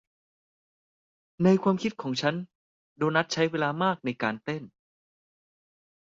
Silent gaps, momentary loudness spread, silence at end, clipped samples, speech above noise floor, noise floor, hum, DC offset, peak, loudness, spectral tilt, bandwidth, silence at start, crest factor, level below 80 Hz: 2.55-2.96 s; 12 LU; 1.45 s; under 0.1%; over 63 dB; under -90 dBFS; none; under 0.1%; -10 dBFS; -27 LUFS; -6 dB/octave; 7.6 kHz; 1.4 s; 20 dB; -70 dBFS